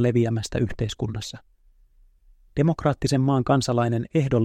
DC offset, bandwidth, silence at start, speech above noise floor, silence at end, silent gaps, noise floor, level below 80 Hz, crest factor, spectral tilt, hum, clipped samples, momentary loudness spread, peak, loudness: under 0.1%; 12.5 kHz; 0 s; 34 dB; 0 s; none; -57 dBFS; -44 dBFS; 18 dB; -6.5 dB/octave; none; under 0.1%; 11 LU; -6 dBFS; -24 LUFS